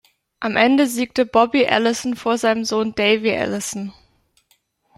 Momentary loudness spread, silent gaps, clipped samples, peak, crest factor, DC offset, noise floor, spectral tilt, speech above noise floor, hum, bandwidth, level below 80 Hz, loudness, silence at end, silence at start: 10 LU; none; under 0.1%; -2 dBFS; 18 dB; under 0.1%; -63 dBFS; -3.5 dB/octave; 45 dB; none; 13.5 kHz; -58 dBFS; -18 LUFS; 1.05 s; 0.4 s